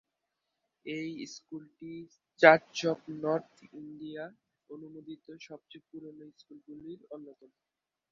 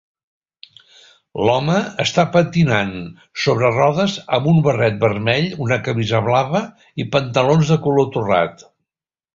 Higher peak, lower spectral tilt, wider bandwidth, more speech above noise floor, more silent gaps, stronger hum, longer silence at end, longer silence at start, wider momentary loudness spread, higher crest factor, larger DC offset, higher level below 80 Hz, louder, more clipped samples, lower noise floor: about the same, -2 dBFS vs 0 dBFS; second, -3 dB/octave vs -6 dB/octave; about the same, 7.4 kHz vs 7.6 kHz; second, 52 dB vs over 73 dB; neither; neither; about the same, 0.8 s vs 0.8 s; second, 0.85 s vs 1.35 s; first, 27 LU vs 7 LU; first, 30 dB vs 18 dB; neither; second, -80 dBFS vs -50 dBFS; second, -28 LUFS vs -17 LUFS; neither; second, -85 dBFS vs under -90 dBFS